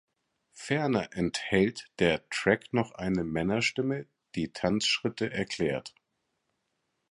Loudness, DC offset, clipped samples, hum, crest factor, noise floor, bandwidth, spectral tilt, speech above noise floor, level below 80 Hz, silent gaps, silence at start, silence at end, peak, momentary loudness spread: -29 LUFS; under 0.1%; under 0.1%; none; 20 dB; -80 dBFS; 11.5 kHz; -5 dB/octave; 51 dB; -56 dBFS; none; 0.55 s; 1.2 s; -10 dBFS; 9 LU